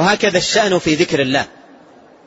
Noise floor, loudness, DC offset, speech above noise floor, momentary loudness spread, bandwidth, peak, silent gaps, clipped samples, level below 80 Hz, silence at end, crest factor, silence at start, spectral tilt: -45 dBFS; -15 LUFS; under 0.1%; 29 dB; 5 LU; 8 kHz; 0 dBFS; none; under 0.1%; -48 dBFS; 0.8 s; 16 dB; 0 s; -3.5 dB/octave